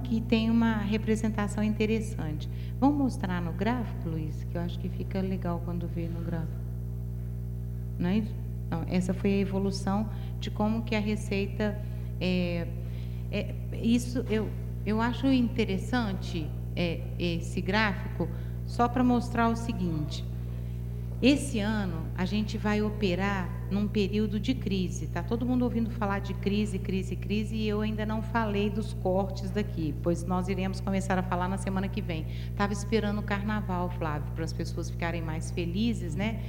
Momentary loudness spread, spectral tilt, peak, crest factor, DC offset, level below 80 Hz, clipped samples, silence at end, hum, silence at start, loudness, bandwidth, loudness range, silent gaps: 8 LU; -6.5 dB/octave; -10 dBFS; 18 dB; under 0.1%; -38 dBFS; under 0.1%; 0 s; 60 Hz at -35 dBFS; 0 s; -30 LUFS; 16 kHz; 3 LU; none